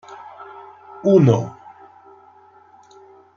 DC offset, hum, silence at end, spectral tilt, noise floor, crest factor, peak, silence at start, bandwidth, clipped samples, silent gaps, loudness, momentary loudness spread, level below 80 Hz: under 0.1%; none; 1.85 s; -9 dB/octave; -49 dBFS; 20 dB; -2 dBFS; 0.1 s; 7.2 kHz; under 0.1%; none; -16 LUFS; 26 LU; -60 dBFS